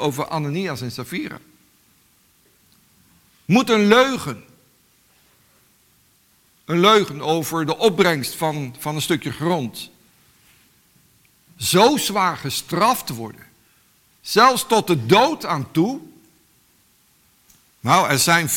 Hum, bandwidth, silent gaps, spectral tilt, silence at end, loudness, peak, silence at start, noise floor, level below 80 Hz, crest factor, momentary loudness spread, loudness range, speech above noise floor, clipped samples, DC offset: none; 17.5 kHz; none; -4 dB/octave; 0 s; -19 LUFS; 0 dBFS; 0 s; -59 dBFS; -60 dBFS; 20 dB; 16 LU; 6 LU; 40 dB; under 0.1%; under 0.1%